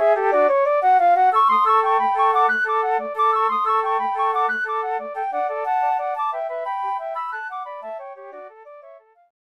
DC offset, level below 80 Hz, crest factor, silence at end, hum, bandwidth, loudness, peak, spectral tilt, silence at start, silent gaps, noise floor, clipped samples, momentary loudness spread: under 0.1%; -80 dBFS; 14 dB; 0.5 s; none; 9.6 kHz; -20 LUFS; -6 dBFS; -3.5 dB/octave; 0 s; none; -47 dBFS; under 0.1%; 16 LU